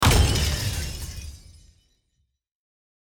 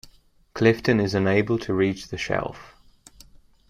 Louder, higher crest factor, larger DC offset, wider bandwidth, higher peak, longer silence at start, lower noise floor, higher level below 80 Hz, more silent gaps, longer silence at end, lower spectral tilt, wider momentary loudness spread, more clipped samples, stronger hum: about the same, -24 LUFS vs -23 LUFS; about the same, 20 dB vs 20 dB; neither; first, 19.5 kHz vs 14.5 kHz; about the same, -6 dBFS vs -4 dBFS; about the same, 0 s vs 0.05 s; first, -73 dBFS vs -55 dBFS; first, -30 dBFS vs -52 dBFS; neither; first, 1.8 s vs 1 s; second, -4 dB/octave vs -6.5 dB/octave; first, 19 LU vs 13 LU; neither; neither